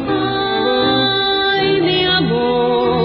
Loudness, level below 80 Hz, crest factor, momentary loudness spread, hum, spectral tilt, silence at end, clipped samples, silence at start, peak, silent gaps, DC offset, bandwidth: -15 LUFS; -42 dBFS; 12 dB; 3 LU; none; -10.5 dB/octave; 0 s; under 0.1%; 0 s; -4 dBFS; none; under 0.1%; 5.8 kHz